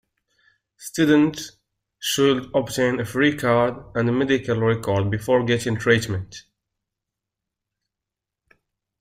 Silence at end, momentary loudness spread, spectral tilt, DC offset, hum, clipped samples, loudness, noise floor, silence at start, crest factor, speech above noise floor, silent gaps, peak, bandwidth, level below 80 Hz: 2.6 s; 13 LU; -5.5 dB/octave; under 0.1%; none; under 0.1%; -21 LUFS; -86 dBFS; 0.8 s; 20 dB; 65 dB; none; -4 dBFS; 16 kHz; -54 dBFS